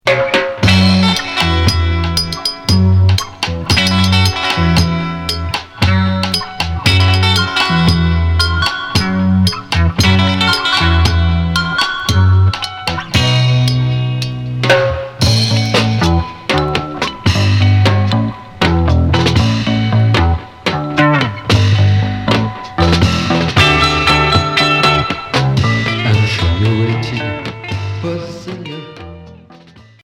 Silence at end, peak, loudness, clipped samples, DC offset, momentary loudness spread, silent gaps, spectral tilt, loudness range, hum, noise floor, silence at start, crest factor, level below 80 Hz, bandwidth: 0.5 s; 0 dBFS; -13 LUFS; under 0.1%; under 0.1%; 9 LU; none; -5.5 dB/octave; 2 LU; none; -41 dBFS; 0.05 s; 12 dB; -26 dBFS; 15.5 kHz